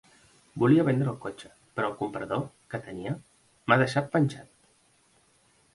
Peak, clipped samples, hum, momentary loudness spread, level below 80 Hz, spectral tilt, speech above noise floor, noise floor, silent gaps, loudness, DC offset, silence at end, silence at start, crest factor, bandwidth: -6 dBFS; under 0.1%; none; 16 LU; -64 dBFS; -7.5 dB/octave; 38 dB; -65 dBFS; none; -28 LUFS; under 0.1%; 1.3 s; 0.55 s; 24 dB; 11.5 kHz